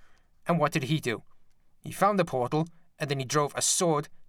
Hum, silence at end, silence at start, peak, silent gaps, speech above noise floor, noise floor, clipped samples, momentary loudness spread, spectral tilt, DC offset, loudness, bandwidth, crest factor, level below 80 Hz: none; 0.05 s; 0 s; -10 dBFS; none; 28 dB; -55 dBFS; under 0.1%; 13 LU; -4 dB/octave; under 0.1%; -28 LUFS; 18 kHz; 18 dB; -62 dBFS